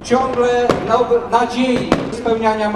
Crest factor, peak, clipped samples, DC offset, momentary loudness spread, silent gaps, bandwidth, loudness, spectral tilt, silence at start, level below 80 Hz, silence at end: 16 dB; 0 dBFS; under 0.1%; under 0.1%; 3 LU; none; 11.5 kHz; -16 LUFS; -5.5 dB/octave; 0 s; -42 dBFS; 0 s